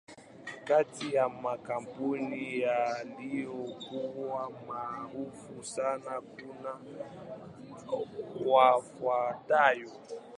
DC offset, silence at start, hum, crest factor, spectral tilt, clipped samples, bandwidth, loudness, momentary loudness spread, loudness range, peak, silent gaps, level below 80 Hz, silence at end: under 0.1%; 0.1 s; none; 24 dB; -4.5 dB/octave; under 0.1%; 11 kHz; -32 LUFS; 19 LU; 10 LU; -10 dBFS; none; -76 dBFS; 0.05 s